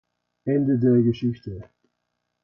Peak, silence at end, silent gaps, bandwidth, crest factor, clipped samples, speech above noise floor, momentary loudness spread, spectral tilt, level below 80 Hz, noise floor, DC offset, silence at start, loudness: -10 dBFS; 0.8 s; none; 5.8 kHz; 14 dB; under 0.1%; 57 dB; 18 LU; -10.5 dB/octave; -56 dBFS; -78 dBFS; under 0.1%; 0.45 s; -22 LUFS